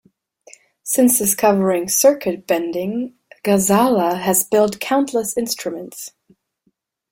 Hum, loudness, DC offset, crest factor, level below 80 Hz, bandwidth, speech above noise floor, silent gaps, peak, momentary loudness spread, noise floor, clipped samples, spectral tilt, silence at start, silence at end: none; -17 LUFS; under 0.1%; 16 dB; -58 dBFS; 17 kHz; 49 dB; none; -2 dBFS; 15 LU; -67 dBFS; under 0.1%; -4 dB/octave; 0.85 s; 1.05 s